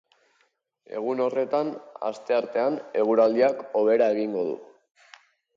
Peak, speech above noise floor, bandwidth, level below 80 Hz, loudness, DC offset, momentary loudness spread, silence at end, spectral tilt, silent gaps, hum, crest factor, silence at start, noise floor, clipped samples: -8 dBFS; 46 dB; 7.4 kHz; -78 dBFS; -25 LUFS; under 0.1%; 12 LU; 0.95 s; -6.5 dB/octave; none; none; 18 dB; 0.9 s; -70 dBFS; under 0.1%